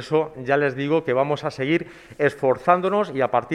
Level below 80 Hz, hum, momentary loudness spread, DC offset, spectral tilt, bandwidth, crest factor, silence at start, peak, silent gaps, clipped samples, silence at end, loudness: -60 dBFS; none; 5 LU; under 0.1%; -7 dB/octave; 11.5 kHz; 20 dB; 0 s; -2 dBFS; none; under 0.1%; 0 s; -22 LUFS